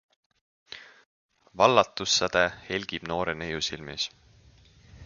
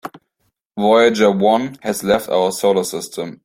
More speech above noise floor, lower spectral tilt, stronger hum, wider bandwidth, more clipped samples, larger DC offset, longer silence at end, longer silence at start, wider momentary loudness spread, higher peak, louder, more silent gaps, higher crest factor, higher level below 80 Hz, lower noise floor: second, 30 dB vs 53 dB; second, -2.5 dB/octave vs -4.5 dB/octave; neither; second, 7.4 kHz vs 16.5 kHz; neither; neither; second, 0 s vs 0.15 s; first, 0.7 s vs 0.05 s; first, 22 LU vs 13 LU; second, -4 dBFS vs 0 dBFS; second, -26 LUFS vs -16 LUFS; first, 1.06-1.29 s vs 0.65-0.70 s; first, 26 dB vs 16 dB; about the same, -56 dBFS vs -56 dBFS; second, -57 dBFS vs -69 dBFS